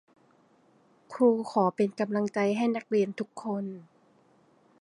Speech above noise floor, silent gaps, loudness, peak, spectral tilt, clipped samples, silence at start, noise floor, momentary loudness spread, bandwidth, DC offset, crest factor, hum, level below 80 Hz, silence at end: 36 dB; none; -28 LUFS; -10 dBFS; -7 dB/octave; under 0.1%; 1.1 s; -63 dBFS; 12 LU; 11 kHz; under 0.1%; 18 dB; none; -80 dBFS; 1 s